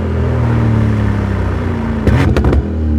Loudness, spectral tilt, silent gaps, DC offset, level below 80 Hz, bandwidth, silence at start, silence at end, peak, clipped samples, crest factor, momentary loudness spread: -14 LUFS; -8.5 dB/octave; none; under 0.1%; -20 dBFS; 9.8 kHz; 0 s; 0 s; -2 dBFS; under 0.1%; 12 dB; 5 LU